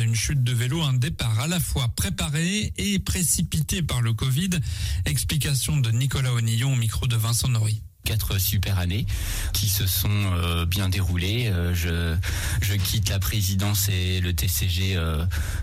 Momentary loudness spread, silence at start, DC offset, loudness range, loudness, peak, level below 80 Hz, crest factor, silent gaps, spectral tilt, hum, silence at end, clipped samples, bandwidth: 4 LU; 0 s; under 0.1%; 1 LU; -24 LUFS; -10 dBFS; -34 dBFS; 14 dB; none; -4 dB/octave; none; 0 s; under 0.1%; 16 kHz